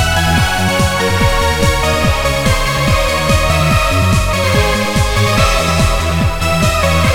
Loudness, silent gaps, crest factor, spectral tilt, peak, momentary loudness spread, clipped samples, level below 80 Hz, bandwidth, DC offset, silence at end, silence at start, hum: -13 LUFS; none; 12 dB; -4.5 dB/octave; -2 dBFS; 2 LU; under 0.1%; -20 dBFS; 18.5 kHz; under 0.1%; 0 s; 0 s; none